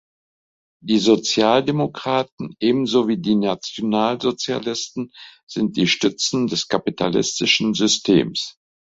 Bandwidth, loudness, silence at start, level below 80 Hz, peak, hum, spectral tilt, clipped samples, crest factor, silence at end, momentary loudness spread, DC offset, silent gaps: 8 kHz; -19 LUFS; 0.85 s; -58 dBFS; -2 dBFS; none; -4 dB/octave; under 0.1%; 18 dB; 0.5 s; 10 LU; under 0.1%; 2.32-2.38 s, 5.43-5.47 s